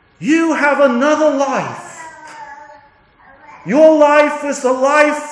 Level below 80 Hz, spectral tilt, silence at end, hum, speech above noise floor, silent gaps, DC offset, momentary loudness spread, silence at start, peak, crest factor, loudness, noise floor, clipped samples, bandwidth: -66 dBFS; -4.5 dB/octave; 0 s; none; 35 dB; none; under 0.1%; 23 LU; 0.2 s; 0 dBFS; 14 dB; -13 LUFS; -48 dBFS; under 0.1%; 10.5 kHz